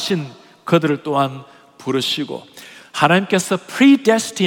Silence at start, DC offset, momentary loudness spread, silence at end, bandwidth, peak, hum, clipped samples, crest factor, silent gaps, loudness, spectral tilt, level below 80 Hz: 0 s; under 0.1%; 21 LU; 0 s; 17.5 kHz; 0 dBFS; none; under 0.1%; 18 dB; none; -17 LUFS; -4.5 dB/octave; -68 dBFS